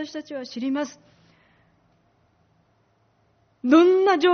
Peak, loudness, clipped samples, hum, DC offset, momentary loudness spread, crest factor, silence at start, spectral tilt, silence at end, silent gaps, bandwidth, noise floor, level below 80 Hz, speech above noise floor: -4 dBFS; -21 LUFS; under 0.1%; none; under 0.1%; 18 LU; 20 dB; 0 s; -2 dB/octave; 0 s; none; 6.6 kHz; -65 dBFS; -72 dBFS; 44 dB